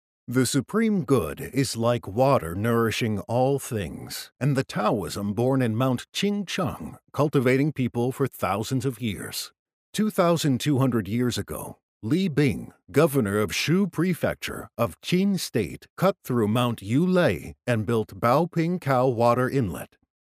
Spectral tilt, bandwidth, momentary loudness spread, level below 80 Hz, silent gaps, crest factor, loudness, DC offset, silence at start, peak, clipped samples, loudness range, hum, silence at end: -6 dB/octave; 16 kHz; 10 LU; -56 dBFS; 9.59-9.66 s, 9.73-9.93 s, 11.83-12.01 s, 15.90-15.97 s; 18 dB; -25 LUFS; under 0.1%; 0.3 s; -6 dBFS; under 0.1%; 2 LU; none; 0.4 s